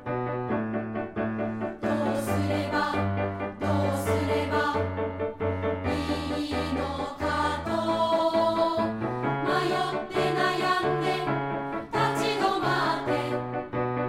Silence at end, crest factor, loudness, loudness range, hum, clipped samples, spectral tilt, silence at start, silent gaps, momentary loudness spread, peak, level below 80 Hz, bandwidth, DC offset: 0 s; 16 dB; -27 LUFS; 3 LU; none; under 0.1%; -6 dB/octave; 0 s; none; 6 LU; -10 dBFS; -50 dBFS; 16 kHz; under 0.1%